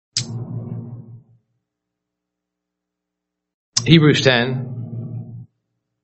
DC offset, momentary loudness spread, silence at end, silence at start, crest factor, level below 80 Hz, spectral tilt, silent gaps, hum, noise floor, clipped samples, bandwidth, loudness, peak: under 0.1%; 22 LU; 0.6 s; 0.15 s; 22 dB; -56 dBFS; -4.5 dB/octave; 3.54-3.72 s; 60 Hz at -55 dBFS; -81 dBFS; under 0.1%; 8.2 kHz; -17 LUFS; 0 dBFS